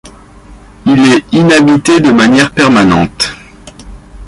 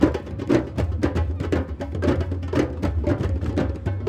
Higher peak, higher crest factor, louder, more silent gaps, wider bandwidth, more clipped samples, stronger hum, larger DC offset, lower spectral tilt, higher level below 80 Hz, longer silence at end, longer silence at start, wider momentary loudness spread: first, 0 dBFS vs -4 dBFS; second, 10 dB vs 20 dB; first, -8 LUFS vs -24 LUFS; neither; first, 11.5 kHz vs 9.4 kHz; neither; neither; neither; second, -5 dB/octave vs -8 dB/octave; about the same, -34 dBFS vs -32 dBFS; about the same, 0 s vs 0 s; about the same, 0.05 s vs 0 s; first, 8 LU vs 4 LU